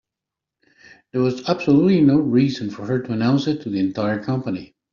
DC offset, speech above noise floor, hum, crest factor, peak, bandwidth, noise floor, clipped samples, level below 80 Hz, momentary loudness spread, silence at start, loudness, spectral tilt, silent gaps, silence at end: under 0.1%; 67 dB; none; 16 dB; -4 dBFS; 7.2 kHz; -85 dBFS; under 0.1%; -58 dBFS; 10 LU; 1.15 s; -20 LUFS; -7 dB/octave; none; 0.3 s